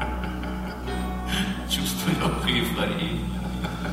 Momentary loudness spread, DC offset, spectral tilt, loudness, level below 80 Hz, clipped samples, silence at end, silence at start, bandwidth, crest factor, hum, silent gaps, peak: 8 LU; under 0.1%; -4.5 dB/octave; -27 LUFS; -34 dBFS; under 0.1%; 0 s; 0 s; 16 kHz; 20 dB; none; none; -8 dBFS